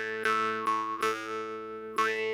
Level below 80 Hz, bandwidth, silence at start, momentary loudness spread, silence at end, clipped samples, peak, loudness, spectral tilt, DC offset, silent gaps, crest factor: -72 dBFS; 17 kHz; 0 s; 8 LU; 0 s; under 0.1%; -12 dBFS; -31 LUFS; -3 dB/octave; under 0.1%; none; 18 dB